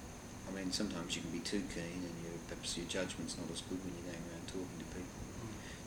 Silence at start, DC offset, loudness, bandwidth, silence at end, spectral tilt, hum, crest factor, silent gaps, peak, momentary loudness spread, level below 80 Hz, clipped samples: 0 s; under 0.1%; -43 LUFS; over 20 kHz; 0 s; -4 dB/octave; none; 20 dB; none; -24 dBFS; 8 LU; -58 dBFS; under 0.1%